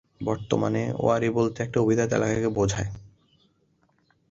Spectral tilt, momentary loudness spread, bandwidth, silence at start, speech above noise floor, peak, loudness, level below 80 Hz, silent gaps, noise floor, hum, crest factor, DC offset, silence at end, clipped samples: -6.5 dB/octave; 8 LU; 8 kHz; 0.2 s; 43 dB; -6 dBFS; -25 LUFS; -50 dBFS; none; -67 dBFS; none; 20 dB; under 0.1%; 1.25 s; under 0.1%